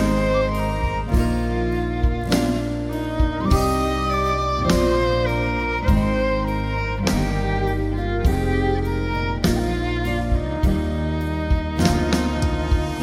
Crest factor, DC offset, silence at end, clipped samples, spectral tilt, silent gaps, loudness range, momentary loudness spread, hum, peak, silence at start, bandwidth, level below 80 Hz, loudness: 16 dB; under 0.1%; 0 s; under 0.1%; -6.5 dB/octave; none; 2 LU; 5 LU; none; -4 dBFS; 0 s; 16 kHz; -26 dBFS; -22 LUFS